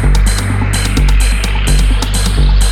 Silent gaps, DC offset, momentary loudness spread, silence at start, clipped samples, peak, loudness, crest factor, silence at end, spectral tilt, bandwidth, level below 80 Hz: none; under 0.1%; 2 LU; 0 s; under 0.1%; 0 dBFS; -13 LUFS; 8 dB; 0 s; -4 dB/octave; 14.5 kHz; -10 dBFS